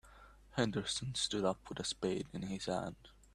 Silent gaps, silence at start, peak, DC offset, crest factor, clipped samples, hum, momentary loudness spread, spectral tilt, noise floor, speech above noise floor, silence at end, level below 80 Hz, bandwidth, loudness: none; 0.05 s; -16 dBFS; under 0.1%; 22 dB; under 0.1%; none; 8 LU; -4 dB/octave; -60 dBFS; 21 dB; 0.25 s; -62 dBFS; 13 kHz; -38 LUFS